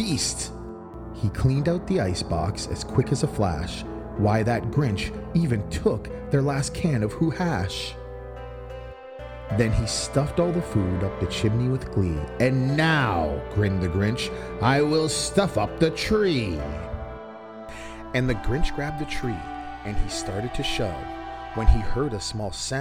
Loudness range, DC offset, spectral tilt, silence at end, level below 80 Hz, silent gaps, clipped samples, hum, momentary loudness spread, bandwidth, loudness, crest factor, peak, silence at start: 5 LU; under 0.1%; -5.5 dB/octave; 0 s; -34 dBFS; none; under 0.1%; none; 16 LU; 16 kHz; -25 LUFS; 20 dB; -4 dBFS; 0 s